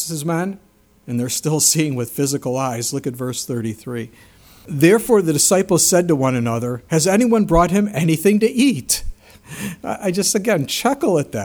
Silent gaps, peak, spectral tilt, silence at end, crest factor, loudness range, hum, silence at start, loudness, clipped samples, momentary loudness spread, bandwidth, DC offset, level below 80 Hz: none; 0 dBFS; -4.5 dB/octave; 0 s; 18 dB; 5 LU; none; 0 s; -17 LUFS; under 0.1%; 13 LU; over 20 kHz; under 0.1%; -40 dBFS